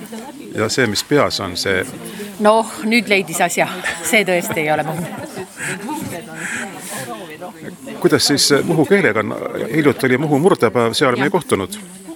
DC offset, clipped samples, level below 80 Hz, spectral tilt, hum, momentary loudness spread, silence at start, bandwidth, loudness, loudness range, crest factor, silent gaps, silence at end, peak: under 0.1%; under 0.1%; -56 dBFS; -4 dB/octave; none; 16 LU; 0 s; 19.5 kHz; -17 LUFS; 7 LU; 18 dB; none; 0 s; 0 dBFS